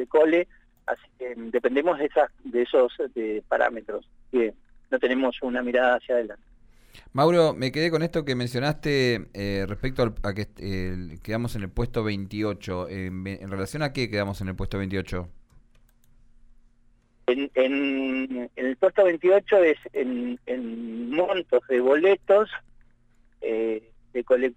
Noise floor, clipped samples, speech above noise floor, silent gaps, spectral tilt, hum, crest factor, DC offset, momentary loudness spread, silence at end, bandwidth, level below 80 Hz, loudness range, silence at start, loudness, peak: -60 dBFS; under 0.1%; 35 dB; none; -6.5 dB/octave; none; 18 dB; under 0.1%; 13 LU; 0.05 s; 16 kHz; -46 dBFS; 8 LU; 0 s; -25 LUFS; -8 dBFS